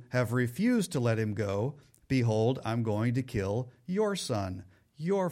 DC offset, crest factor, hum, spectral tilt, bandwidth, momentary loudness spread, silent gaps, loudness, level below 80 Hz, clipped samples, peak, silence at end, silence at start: under 0.1%; 14 dB; none; -6.5 dB/octave; 16 kHz; 7 LU; none; -31 LUFS; -60 dBFS; under 0.1%; -16 dBFS; 0 s; 0 s